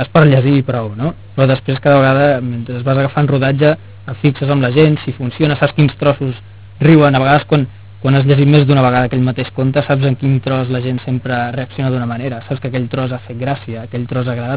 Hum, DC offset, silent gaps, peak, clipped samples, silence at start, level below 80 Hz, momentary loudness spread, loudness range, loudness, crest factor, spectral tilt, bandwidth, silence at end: none; 0.8%; none; 0 dBFS; under 0.1%; 0 s; -42 dBFS; 12 LU; 7 LU; -14 LUFS; 14 dB; -11.5 dB/octave; 4 kHz; 0 s